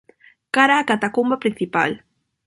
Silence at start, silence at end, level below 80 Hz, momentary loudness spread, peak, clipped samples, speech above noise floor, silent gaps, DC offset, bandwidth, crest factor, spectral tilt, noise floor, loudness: 0.55 s; 0.5 s; -64 dBFS; 8 LU; -2 dBFS; under 0.1%; 26 dB; none; under 0.1%; 11.5 kHz; 18 dB; -4.5 dB/octave; -45 dBFS; -19 LUFS